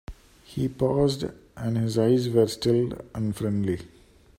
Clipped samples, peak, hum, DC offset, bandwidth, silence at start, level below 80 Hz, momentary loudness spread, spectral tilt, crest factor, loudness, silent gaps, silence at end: under 0.1%; -8 dBFS; none; under 0.1%; 16 kHz; 0.1 s; -50 dBFS; 11 LU; -7 dB/octave; 18 dB; -26 LUFS; none; 0.5 s